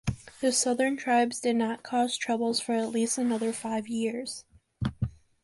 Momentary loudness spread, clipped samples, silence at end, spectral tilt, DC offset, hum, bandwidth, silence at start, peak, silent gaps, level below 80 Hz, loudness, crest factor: 11 LU; under 0.1%; 0.35 s; -4 dB/octave; under 0.1%; none; 11.5 kHz; 0.05 s; -12 dBFS; none; -52 dBFS; -29 LUFS; 16 dB